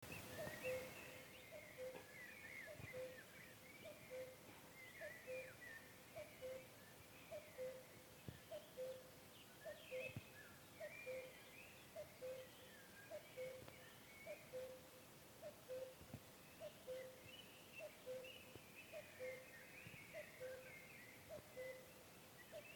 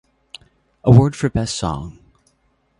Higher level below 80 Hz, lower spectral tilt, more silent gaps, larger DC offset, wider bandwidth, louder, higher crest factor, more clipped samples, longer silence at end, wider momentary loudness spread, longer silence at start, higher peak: second, -80 dBFS vs -38 dBFS; second, -3.5 dB/octave vs -7 dB/octave; neither; neither; first, 19 kHz vs 11 kHz; second, -56 LUFS vs -17 LUFS; about the same, 20 dB vs 18 dB; neither; second, 0 s vs 0.9 s; second, 8 LU vs 16 LU; second, 0 s vs 0.85 s; second, -38 dBFS vs 0 dBFS